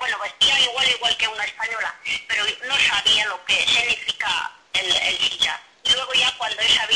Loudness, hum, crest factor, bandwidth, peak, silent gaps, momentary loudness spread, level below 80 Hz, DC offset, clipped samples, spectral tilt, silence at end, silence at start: -19 LUFS; none; 14 dB; 11 kHz; -8 dBFS; none; 9 LU; -56 dBFS; under 0.1%; under 0.1%; 1 dB/octave; 0 s; 0 s